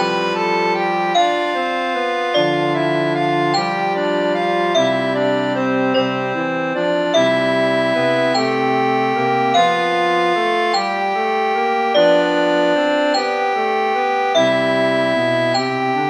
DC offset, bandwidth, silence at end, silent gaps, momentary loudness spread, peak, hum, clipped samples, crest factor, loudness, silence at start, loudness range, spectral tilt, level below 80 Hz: under 0.1%; 10.5 kHz; 0 s; none; 4 LU; -2 dBFS; none; under 0.1%; 14 dB; -17 LUFS; 0 s; 2 LU; -5 dB/octave; -64 dBFS